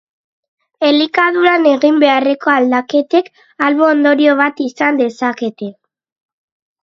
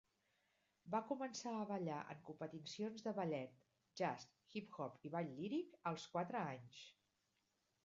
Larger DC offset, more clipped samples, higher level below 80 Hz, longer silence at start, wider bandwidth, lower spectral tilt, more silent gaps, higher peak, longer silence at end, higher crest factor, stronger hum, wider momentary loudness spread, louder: neither; neither; first, -66 dBFS vs -88 dBFS; about the same, 0.8 s vs 0.85 s; about the same, 7.4 kHz vs 7.4 kHz; about the same, -4.5 dB/octave vs -5 dB/octave; neither; first, 0 dBFS vs -28 dBFS; first, 1.1 s vs 0.95 s; second, 14 dB vs 20 dB; neither; second, 8 LU vs 11 LU; first, -13 LUFS vs -47 LUFS